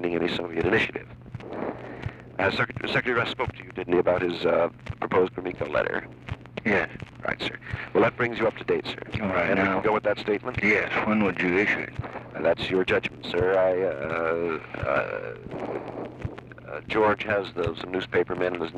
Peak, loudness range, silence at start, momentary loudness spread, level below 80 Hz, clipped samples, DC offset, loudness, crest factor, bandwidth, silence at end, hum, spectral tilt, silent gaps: -10 dBFS; 4 LU; 0 s; 13 LU; -52 dBFS; under 0.1%; under 0.1%; -26 LUFS; 16 dB; 10 kHz; 0 s; none; -6.5 dB/octave; none